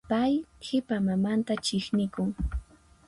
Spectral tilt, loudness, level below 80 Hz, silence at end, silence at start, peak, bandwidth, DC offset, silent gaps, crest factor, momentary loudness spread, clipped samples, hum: -6 dB/octave; -29 LUFS; -42 dBFS; 0.45 s; 0.1 s; -14 dBFS; 11.5 kHz; under 0.1%; none; 14 dB; 7 LU; under 0.1%; none